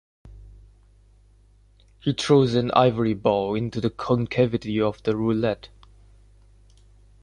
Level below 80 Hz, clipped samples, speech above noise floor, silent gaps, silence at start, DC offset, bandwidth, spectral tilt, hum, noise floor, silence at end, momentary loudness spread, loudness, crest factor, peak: -50 dBFS; under 0.1%; 34 dB; none; 0.25 s; under 0.1%; 11 kHz; -7 dB/octave; 50 Hz at -50 dBFS; -55 dBFS; 1.55 s; 8 LU; -23 LUFS; 22 dB; -2 dBFS